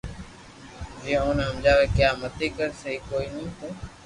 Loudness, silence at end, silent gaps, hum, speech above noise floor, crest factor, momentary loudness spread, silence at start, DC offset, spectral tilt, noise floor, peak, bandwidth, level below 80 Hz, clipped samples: -25 LUFS; 0 s; none; none; 21 dB; 18 dB; 22 LU; 0.05 s; under 0.1%; -5.5 dB/octave; -45 dBFS; -8 dBFS; 11.5 kHz; -38 dBFS; under 0.1%